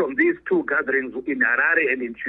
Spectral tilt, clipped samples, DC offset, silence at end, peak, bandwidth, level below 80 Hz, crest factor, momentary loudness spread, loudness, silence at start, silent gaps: -8.5 dB/octave; under 0.1%; under 0.1%; 0 s; -6 dBFS; 4 kHz; -62 dBFS; 16 dB; 6 LU; -20 LUFS; 0 s; none